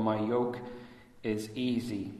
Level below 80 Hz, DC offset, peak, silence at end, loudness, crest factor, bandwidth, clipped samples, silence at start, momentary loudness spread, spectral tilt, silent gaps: -64 dBFS; under 0.1%; -16 dBFS; 0 s; -33 LUFS; 18 dB; 13.5 kHz; under 0.1%; 0 s; 17 LU; -6.5 dB/octave; none